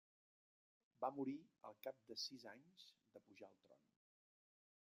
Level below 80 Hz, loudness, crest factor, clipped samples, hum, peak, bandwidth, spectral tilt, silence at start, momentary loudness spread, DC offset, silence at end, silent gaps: under -90 dBFS; -51 LUFS; 24 dB; under 0.1%; none; -30 dBFS; 15 kHz; -4 dB/octave; 1 s; 18 LU; under 0.1%; 1.25 s; none